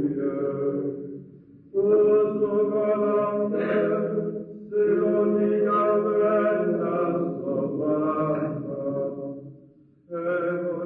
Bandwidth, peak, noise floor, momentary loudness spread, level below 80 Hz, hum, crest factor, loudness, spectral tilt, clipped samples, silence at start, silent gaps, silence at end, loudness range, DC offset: 3.8 kHz; -12 dBFS; -54 dBFS; 10 LU; -68 dBFS; none; 12 dB; -24 LUFS; -11.5 dB/octave; under 0.1%; 0 s; none; 0 s; 5 LU; under 0.1%